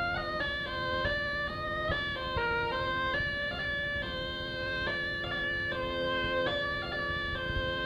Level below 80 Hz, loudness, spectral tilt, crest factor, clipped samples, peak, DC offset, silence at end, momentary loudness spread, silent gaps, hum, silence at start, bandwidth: -46 dBFS; -32 LUFS; -5.5 dB/octave; 14 dB; under 0.1%; -18 dBFS; under 0.1%; 0 s; 3 LU; none; none; 0 s; 18.5 kHz